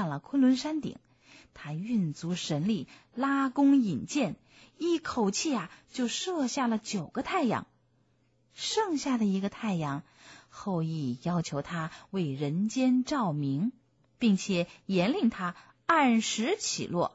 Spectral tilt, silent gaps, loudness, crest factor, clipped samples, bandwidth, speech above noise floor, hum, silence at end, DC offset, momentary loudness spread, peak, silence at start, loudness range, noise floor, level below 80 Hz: -5 dB/octave; none; -30 LUFS; 18 dB; under 0.1%; 8 kHz; 40 dB; none; 0.05 s; under 0.1%; 11 LU; -12 dBFS; 0 s; 4 LU; -69 dBFS; -66 dBFS